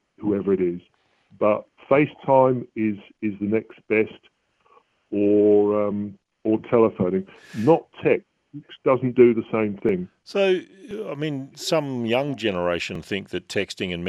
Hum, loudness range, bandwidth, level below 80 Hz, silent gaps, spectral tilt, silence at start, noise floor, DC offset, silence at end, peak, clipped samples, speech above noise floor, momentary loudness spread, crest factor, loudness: none; 4 LU; 13 kHz; -60 dBFS; none; -6.5 dB/octave; 0.2 s; -59 dBFS; under 0.1%; 0 s; -2 dBFS; under 0.1%; 37 dB; 12 LU; 20 dB; -23 LUFS